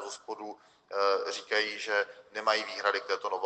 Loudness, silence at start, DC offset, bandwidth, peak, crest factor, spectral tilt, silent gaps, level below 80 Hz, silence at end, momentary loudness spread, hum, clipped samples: -31 LUFS; 0 s; under 0.1%; 9 kHz; -12 dBFS; 22 dB; -0.5 dB/octave; none; -84 dBFS; 0 s; 12 LU; none; under 0.1%